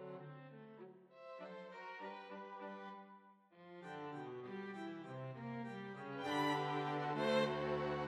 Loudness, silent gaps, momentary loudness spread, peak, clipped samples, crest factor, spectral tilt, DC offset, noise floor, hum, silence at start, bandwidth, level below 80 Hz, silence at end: -44 LUFS; none; 20 LU; -26 dBFS; under 0.1%; 18 dB; -6 dB/octave; under 0.1%; -64 dBFS; none; 0 s; 15 kHz; -76 dBFS; 0 s